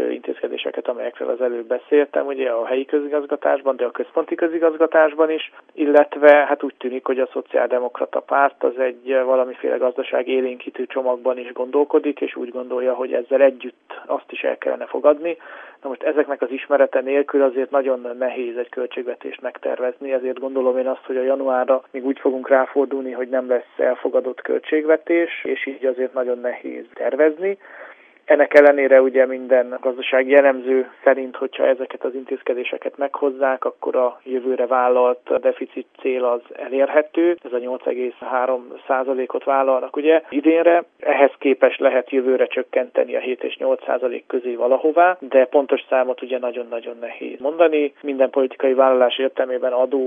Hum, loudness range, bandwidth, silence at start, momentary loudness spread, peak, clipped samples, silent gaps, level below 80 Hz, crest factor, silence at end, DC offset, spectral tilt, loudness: none; 5 LU; 4.2 kHz; 0 s; 11 LU; 0 dBFS; under 0.1%; none; -84 dBFS; 20 dB; 0 s; under 0.1%; -5.5 dB/octave; -19 LUFS